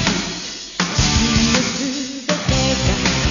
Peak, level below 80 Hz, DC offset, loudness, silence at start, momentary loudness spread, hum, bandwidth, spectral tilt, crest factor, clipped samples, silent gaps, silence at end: -2 dBFS; -28 dBFS; under 0.1%; -18 LUFS; 0 s; 9 LU; none; 7.4 kHz; -3.5 dB/octave; 18 dB; under 0.1%; none; 0 s